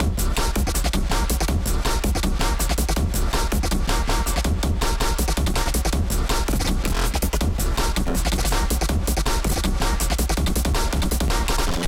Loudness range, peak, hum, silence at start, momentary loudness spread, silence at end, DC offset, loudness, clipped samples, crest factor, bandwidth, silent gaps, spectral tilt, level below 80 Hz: 0 LU; -6 dBFS; none; 0 s; 1 LU; 0 s; under 0.1%; -23 LUFS; under 0.1%; 14 dB; 17 kHz; none; -4 dB/octave; -22 dBFS